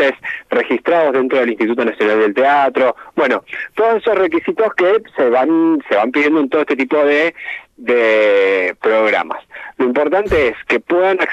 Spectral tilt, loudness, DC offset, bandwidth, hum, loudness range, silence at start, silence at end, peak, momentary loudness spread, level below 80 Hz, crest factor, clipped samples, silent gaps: -6 dB/octave; -14 LUFS; under 0.1%; 8.2 kHz; none; 1 LU; 0 s; 0 s; -2 dBFS; 6 LU; -44 dBFS; 12 dB; under 0.1%; none